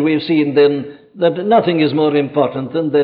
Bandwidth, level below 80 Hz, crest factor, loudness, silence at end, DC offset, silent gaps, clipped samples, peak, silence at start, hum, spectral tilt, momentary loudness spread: 5 kHz; -64 dBFS; 12 dB; -15 LUFS; 0 s; under 0.1%; none; under 0.1%; -2 dBFS; 0 s; none; -10 dB/octave; 6 LU